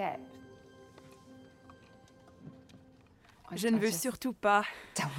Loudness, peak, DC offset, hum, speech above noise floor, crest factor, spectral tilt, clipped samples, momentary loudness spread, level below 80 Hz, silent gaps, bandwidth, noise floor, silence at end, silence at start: -32 LUFS; -14 dBFS; under 0.1%; none; 29 dB; 22 dB; -4 dB/octave; under 0.1%; 27 LU; -70 dBFS; none; 16 kHz; -61 dBFS; 0 s; 0 s